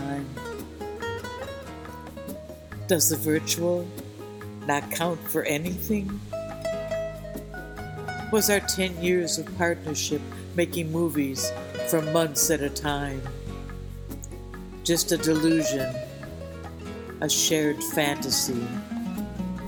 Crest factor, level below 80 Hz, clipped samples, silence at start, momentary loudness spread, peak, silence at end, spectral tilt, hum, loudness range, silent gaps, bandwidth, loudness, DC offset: 22 dB; -46 dBFS; under 0.1%; 0 s; 17 LU; -6 dBFS; 0 s; -3.5 dB/octave; none; 4 LU; none; 19.5 kHz; -26 LUFS; under 0.1%